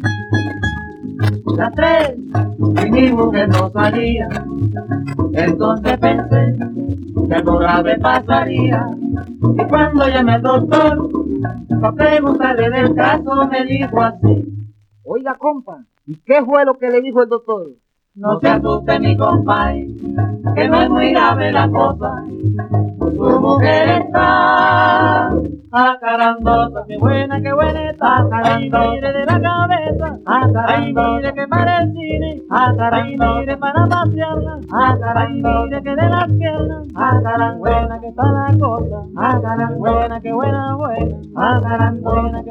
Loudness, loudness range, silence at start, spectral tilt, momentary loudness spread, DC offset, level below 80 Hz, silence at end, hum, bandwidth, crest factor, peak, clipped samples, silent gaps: -15 LUFS; 4 LU; 0 s; -8.5 dB/octave; 9 LU; under 0.1%; -32 dBFS; 0 s; none; 7.2 kHz; 14 dB; 0 dBFS; under 0.1%; none